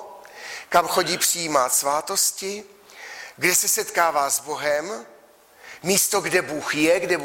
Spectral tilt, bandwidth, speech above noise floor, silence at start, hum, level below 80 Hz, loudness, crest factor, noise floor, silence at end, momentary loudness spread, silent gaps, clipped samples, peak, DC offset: -1.5 dB/octave; 16.5 kHz; 30 dB; 0 s; none; -64 dBFS; -21 LUFS; 18 dB; -52 dBFS; 0 s; 17 LU; none; under 0.1%; -6 dBFS; under 0.1%